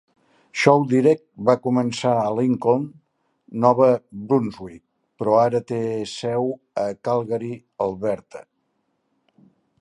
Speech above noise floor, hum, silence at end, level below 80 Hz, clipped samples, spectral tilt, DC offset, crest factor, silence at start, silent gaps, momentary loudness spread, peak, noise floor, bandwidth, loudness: 51 dB; none; 1.4 s; -62 dBFS; under 0.1%; -6.5 dB/octave; under 0.1%; 22 dB; 0.55 s; none; 15 LU; 0 dBFS; -71 dBFS; 11.5 kHz; -21 LUFS